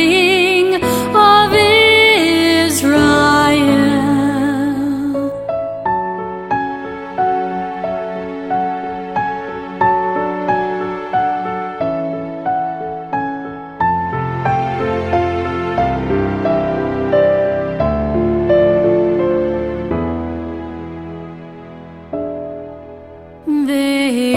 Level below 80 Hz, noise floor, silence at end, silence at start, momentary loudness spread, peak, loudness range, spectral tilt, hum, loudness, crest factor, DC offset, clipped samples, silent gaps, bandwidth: -38 dBFS; -36 dBFS; 0 s; 0 s; 15 LU; 0 dBFS; 11 LU; -5 dB/octave; none; -15 LUFS; 16 dB; under 0.1%; under 0.1%; none; 16.5 kHz